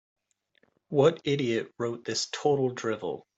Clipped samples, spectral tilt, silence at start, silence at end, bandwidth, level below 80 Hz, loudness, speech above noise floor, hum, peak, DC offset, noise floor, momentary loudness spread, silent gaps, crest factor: under 0.1%; -5 dB/octave; 0.9 s; 0.15 s; 8.2 kHz; -72 dBFS; -28 LUFS; 42 dB; none; -8 dBFS; under 0.1%; -70 dBFS; 9 LU; none; 20 dB